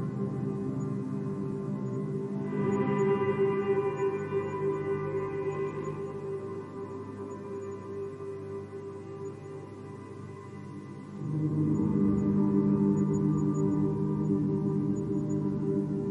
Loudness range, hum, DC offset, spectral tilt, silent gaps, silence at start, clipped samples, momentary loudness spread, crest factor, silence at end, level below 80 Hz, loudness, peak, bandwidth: 13 LU; none; under 0.1%; -9.5 dB/octave; none; 0 s; under 0.1%; 15 LU; 16 dB; 0 s; -60 dBFS; -31 LUFS; -14 dBFS; 8 kHz